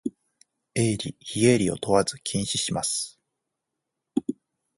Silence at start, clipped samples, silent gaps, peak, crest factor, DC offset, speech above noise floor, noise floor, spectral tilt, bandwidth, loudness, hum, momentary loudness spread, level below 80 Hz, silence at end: 0.05 s; under 0.1%; none; -6 dBFS; 22 dB; under 0.1%; 59 dB; -83 dBFS; -4.5 dB/octave; 11.5 kHz; -25 LUFS; none; 14 LU; -56 dBFS; 0.45 s